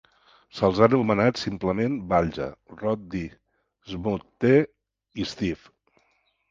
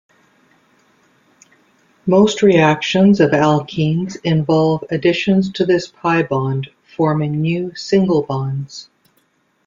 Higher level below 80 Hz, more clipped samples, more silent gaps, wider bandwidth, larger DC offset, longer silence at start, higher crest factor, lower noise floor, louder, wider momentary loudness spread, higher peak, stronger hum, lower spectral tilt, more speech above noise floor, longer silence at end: about the same, -50 dBFS vs -54 dBFS; neither; neither; about the same, 7.6 kHz vs 7.6 kHz; neither; second, 0.55 s vs 2.05 s; first, 24 dB vs 16 dB; first, -69 dBFS vs -61 dBFS; second, -25 LUFS vs -16 LUFS; first, 16 LU vs 10 LU; about the same, -2 dBFS vs -2 dBFS; neither; about the same, -7 dB/octave vs -6.5 dB/octave; about the same, 45 dB vs 46 dB; about the same, 0.95 s vs 0.85 s